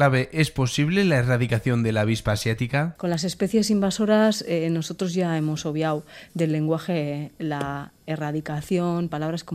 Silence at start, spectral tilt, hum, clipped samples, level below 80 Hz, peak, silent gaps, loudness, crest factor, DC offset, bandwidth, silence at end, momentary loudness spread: 0 s; -6 dB/octave; none; under 0.1%; -50 dBFS; -6 dBFS; none; -24 LUFS; 18 dB; under 0.1%; 15.5 kHz; 0 s; 9 LU